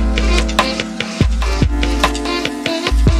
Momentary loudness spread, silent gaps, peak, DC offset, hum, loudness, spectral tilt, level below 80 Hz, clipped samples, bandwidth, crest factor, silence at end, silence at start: 4 LU; none; 0 dBFS; under 0.1%; none; -17 LUFS; -5 dB/octave; -18 dBFS; under 0.1%; 13 kHz; 14 dB; 0 s; 0 s